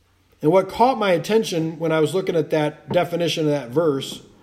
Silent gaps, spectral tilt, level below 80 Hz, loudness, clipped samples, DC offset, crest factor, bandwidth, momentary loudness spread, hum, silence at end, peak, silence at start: none; -5.5 dB/octave; -58 dBFS; -21 LUFS; under 0.1%; under 0.1%; 16 dB; 15.5 kHz; 6 LU; none; 0.25 s; -4 dBFS; 0.4 s